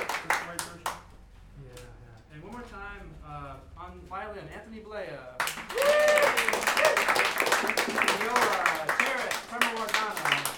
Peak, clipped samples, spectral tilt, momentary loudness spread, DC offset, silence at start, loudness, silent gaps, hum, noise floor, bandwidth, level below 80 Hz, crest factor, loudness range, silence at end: -6 dBFS; under 0.1%; -1.5 dB/octave; 21 LU; under 0.1%; 0 s; -26 LUFS; none; none; -51 dBFS; 18 kHz; -54 dBFS; 24 dB; 19 LU; 0 s